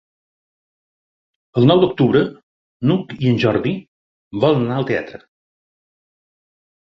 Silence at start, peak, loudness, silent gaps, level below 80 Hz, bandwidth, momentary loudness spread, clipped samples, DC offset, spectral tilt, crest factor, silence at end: 1.55 s; -2 dBFS; -17 LUFS; 2.43-2.80 s, 3.88-4.31 s; -54 dBFS; 6.4 kHz; 11 LU; under 0.1%; under 0.1%; -8.5 dB/octave; 18 dB; 1.75 s